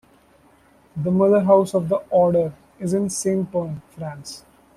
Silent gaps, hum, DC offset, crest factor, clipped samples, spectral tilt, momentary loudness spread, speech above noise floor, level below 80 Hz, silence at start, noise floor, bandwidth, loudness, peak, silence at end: none; none; under 0.1%; 18 dB; under 0.1%; -6.5 dB/octave; 18 LU; 35 dB; -58 dBFS; 0.95 s; -55 dBFS; 14 kHz; -20 LUFS; -2 dBFS; 0.4 s